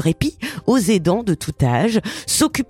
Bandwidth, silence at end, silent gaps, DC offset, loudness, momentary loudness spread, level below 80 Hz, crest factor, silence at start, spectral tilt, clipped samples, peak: 16.5 kHz; 0.05 s; none; under 0.1%; -19 LUFS; 6 LU; -42 dBFS; 16 dB; 0 s; -5 dB/octave; under 0.1%; -4 dBFS